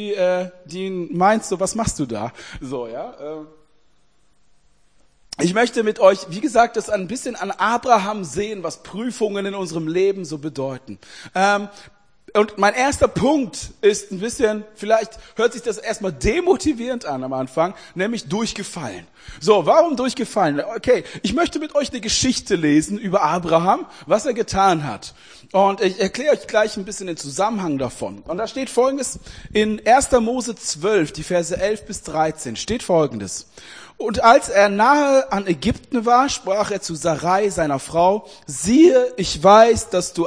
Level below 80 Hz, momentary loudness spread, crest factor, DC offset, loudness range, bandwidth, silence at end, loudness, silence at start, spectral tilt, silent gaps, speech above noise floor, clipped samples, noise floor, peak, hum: -44 dBFS; 14 LU; 20 dB; 0.2%; 6 LU; 10.5 kHz; 0 s; -19 LUFS; 0 s; -4.5 dB/octave; none; 43 dB; under 0.1%; -63 dBFS; 0 dBFS; none